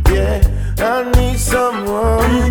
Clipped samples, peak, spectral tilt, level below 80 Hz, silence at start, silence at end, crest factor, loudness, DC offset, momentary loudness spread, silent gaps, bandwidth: under 0.1%; 0 dBFS; -5.5 dB/octave; -16 dBFS; 0 s; 0 s; 14 dB; -15 LUFS; under 0.1%; 3 LU; none; 19 kHz